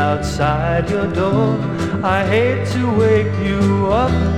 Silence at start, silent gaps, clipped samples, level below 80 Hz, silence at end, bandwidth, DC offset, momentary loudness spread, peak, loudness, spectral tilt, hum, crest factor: 0 s; none; under 0.1%; -30 dBFS; 0 s; 11.5 kHz; under 0.1%; 4 LU; -2 dBFS; -17 LUFS; -7 dB/octave; none; 14 dB